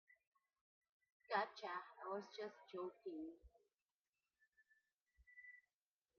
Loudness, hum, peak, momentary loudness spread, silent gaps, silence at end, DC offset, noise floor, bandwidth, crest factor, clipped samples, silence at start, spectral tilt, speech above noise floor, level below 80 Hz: -49 LUFS; none; -28 dBFS; 19 LU; 0.27-0.32 s, 0.61-0.81 s, 0.92-1.00 s, 1.12-1.20 s, 3.74-4.13 s, 5.01-5.07 s; 0.6 s; under 0.1%; under -90 dBFS; 6.4 kHz; 24 dB; under 0.1%; 0.1 s; -2 dB/octave; over 41 dB; -82 dBFS